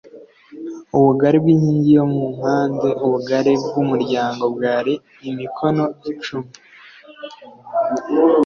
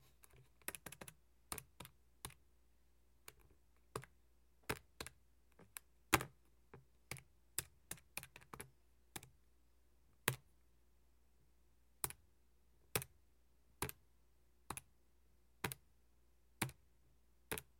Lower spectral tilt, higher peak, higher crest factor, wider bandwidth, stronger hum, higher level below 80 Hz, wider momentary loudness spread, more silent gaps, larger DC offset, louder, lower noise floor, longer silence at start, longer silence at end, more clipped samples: first, -8 dB/octave vs -2.5 dB/octave; first, -2 dBFS vs -14 dBFS; second, 16 dB vs 38 dB; second, 7 kHz vs 16.5 kHz; neither; first, -58 dBFS vs -68 dBFS; about the same, 18 LU vs 20 LU; neither; neither; first, -18 LUFS vs -48 LUFS; second, -43 dBFS vs -75 dBFS; second, 0.15 s vs 0.35 s; second, 0 s vs 0.2 s; neither